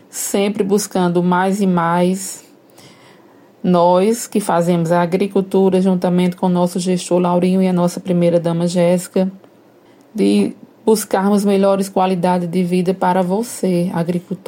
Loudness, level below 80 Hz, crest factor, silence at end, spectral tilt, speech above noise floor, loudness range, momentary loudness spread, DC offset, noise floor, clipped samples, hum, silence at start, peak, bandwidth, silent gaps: -16 LUFS; -64 dBFS; 14 dB; 0.1 s; -6.5 dB/octave; 32 dB; 2 LU; 5 LU; under 0.1%; -47 dBFS; under 0.1%; none; 0.15 s; -2 dBFS; 17 kHz; none